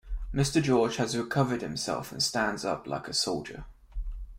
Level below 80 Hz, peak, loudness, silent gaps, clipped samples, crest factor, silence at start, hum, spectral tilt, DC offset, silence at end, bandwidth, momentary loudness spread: -42 dBFS; -12 dBFS; -29 LUFS; none; under 0.1%; 18 dB; 0.05 s; none; -4.5 dB/octave; under 0.1%; 0 s; 16.5 kHz; 16 LU